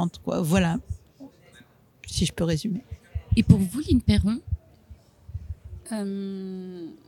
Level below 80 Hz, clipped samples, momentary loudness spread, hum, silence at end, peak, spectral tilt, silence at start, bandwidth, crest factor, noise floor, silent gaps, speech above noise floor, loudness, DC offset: -38 dBFS; under 0.1%; 20 LU; none; 0.15 s; -2 dBFS; -6.5 dB/octave; 0 s; 15.5 kHz; 24 dB; -55 dBFS; none; 31 dB; -25 LUFS; under 0.1%